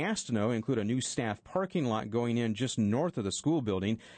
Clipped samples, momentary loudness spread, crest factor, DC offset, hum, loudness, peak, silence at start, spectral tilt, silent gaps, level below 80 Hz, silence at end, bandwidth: under 0.1%; 3 LU; 14 dB; under 0.1%; none; -32 LUFS; -18 dBFS; 0 s; -5.5 dB/octave; none; -66 dBFS; 0 s; 9.4 kHz